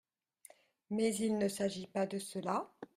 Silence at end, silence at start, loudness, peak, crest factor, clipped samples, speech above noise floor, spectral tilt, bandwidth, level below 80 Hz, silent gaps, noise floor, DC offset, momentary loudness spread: 0.1 s; 0.9 s; -37 LUFS; -22 dBFS; 16 dB; under 0.1%; 27 dB; -5 dB/octave; 15 kHz; -76 dBFS; none; -63 dBFS; under 0.1%; 6 LU